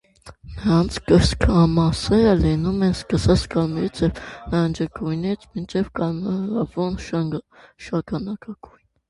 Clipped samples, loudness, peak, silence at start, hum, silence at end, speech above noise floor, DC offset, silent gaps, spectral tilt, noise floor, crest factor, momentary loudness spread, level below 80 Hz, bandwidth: under 0.1%; -21 LUFS; -2 dBFS; 0.25 s; none; 0.55 s; 22 dB; under 0.1%; none; -7 dB/octave; -42 dBFS; 20 dB; 12 LU; -34 dBFS; 11.5 kHz